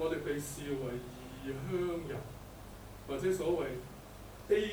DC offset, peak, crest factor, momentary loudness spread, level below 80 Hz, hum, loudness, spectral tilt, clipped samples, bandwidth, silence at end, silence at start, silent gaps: under 0.1%; -18 dBFS; 18 dB; 17 LU; -54 dBFS; 50 Hz at -55 dBFS; -37 LUFS; -5.5 dB/octave; under 0.1%; over 20 kHz; 0 s; 0 s; none